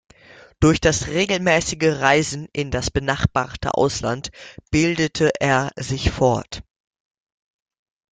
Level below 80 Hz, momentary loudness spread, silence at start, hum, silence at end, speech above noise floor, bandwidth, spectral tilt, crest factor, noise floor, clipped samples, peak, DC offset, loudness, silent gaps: -38 dBFS; 9 LU; 0.6 s; none; 1.5 s; 28 dB; 9.6 kHz; -4.5 dB/octave; 20 dB; -48 dBFS; under 0.1%; -2 dBFS; under 0.1%; -20 LUFS; none